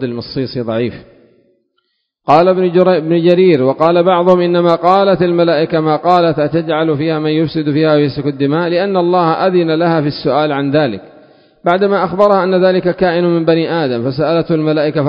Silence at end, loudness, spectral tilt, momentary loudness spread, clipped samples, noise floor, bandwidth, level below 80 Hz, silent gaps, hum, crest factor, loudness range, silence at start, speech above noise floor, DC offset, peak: 0 s; -12 LUFS; -9 dB/octave; 6 LU; 0.1%; -66 dBFS; 5.6 kHz; -50 dBFS; none; none; 12 dB; 3 LU; 0 s; 54 dB; under 0.1%; 0 dBFS